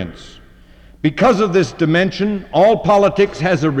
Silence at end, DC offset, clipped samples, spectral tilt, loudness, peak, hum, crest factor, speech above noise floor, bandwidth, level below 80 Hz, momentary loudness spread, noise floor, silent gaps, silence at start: 0 s; under 0.1%; under 0.1%; -6.5 dB/octave; -15 LUFS; -2 dBFS; none; 12 dB; 29 dB; 9.8 kHz; -42 dBFS; 8 LU; -43 dBFS; none; 0 s